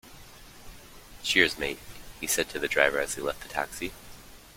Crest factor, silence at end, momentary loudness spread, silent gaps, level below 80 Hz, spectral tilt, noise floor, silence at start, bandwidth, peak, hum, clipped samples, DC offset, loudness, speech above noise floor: 26 dB; 0.05 s; 26 LU; none; -52 dBFS; -1.5 dB/octave; -49 dBFS; 0.05 s; 16.5 kHz; -4 dBFS; none; under 0.1%; under 0.1%; -27 LUFS; 20 dB